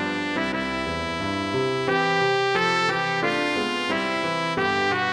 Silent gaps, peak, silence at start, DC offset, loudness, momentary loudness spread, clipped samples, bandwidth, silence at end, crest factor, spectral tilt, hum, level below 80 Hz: none; -8 dBFS; 0 s; under 0.1%; -23 LUFS; 5 LU; under 0.1%; 12.5 kHz; 0 s; 16 dB; -4.5 dB/octave; none; -52 dBFS